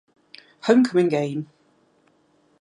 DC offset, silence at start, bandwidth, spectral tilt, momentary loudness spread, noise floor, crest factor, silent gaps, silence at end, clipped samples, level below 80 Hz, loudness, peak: under 0.1%; 0.65 s; 11 kHz; -6.5 dB/octave; 15 LU; -62 dBFS; 20 dB; none; 1.15 s; under 0.1%; -74 dBFS; -21 LUFS; -4 dBFS